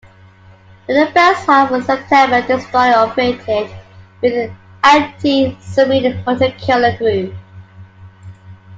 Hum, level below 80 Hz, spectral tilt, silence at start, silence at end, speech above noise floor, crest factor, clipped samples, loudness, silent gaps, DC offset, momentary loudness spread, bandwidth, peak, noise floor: none; -52 dBFS; -5.5 dB/octave; 0.9 s; 0 s; 30 dB; 14 dB; under 0.1%; -14 LUFS; none; under 0.1%; 10 LU; 7.8 kHz; 0 dBFS; -43 dBFS